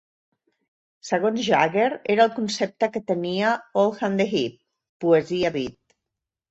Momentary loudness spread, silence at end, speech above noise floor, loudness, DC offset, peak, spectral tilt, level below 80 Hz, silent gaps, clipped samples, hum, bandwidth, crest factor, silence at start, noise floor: 8 LU; 0.8 s; 63 dB; -23 LUFS; under 0.1%; -4 dBFS; -5 dB/octave; -64 dBFS; 4.89-5.00 s; under 0.1%; none; 8.4 kHz; 20 dB; 1.05 s; -85 dBFS